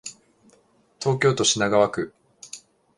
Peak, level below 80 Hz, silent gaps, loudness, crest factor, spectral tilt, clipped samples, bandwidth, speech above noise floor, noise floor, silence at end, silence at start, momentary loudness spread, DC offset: -6 dBFS; -60 dBFS; none; -21 LUFS; 20 dB; -3.5 dB/octave; under 0.1%; 11.5 kHz; 40 dB; -60 dBFS; 0.4 s; 0.05 s; 21 LU; under 0.1%